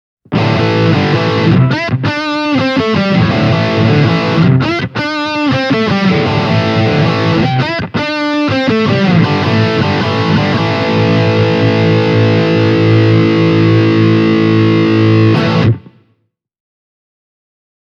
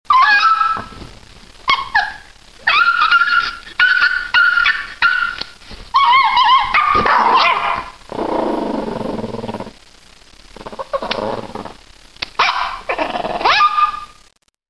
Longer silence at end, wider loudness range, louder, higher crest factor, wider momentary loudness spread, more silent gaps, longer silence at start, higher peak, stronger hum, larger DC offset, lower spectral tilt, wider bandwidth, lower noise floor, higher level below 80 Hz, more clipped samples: first, 2.1 s vs 0.65 s; second, 3 LU vs 11 LU; first, -11 LUFS vs -14 LUFS; second, 10 dB vs 16 dB; second, 5 LU vs 17 LU; neither; first, 0.3 s vs 0.1 s; about the same, 0 dBFS vs 0 dBFS; neither; second, under 0.1% vs 0.7%; first, -7.5 dB/octave vs -3 dB/octave; second, 7.2 kHz vs 11 kHz; first, -61 dBFS vs -52 dBFS; about the same, -42 dBFS vs -44 dBFS; neither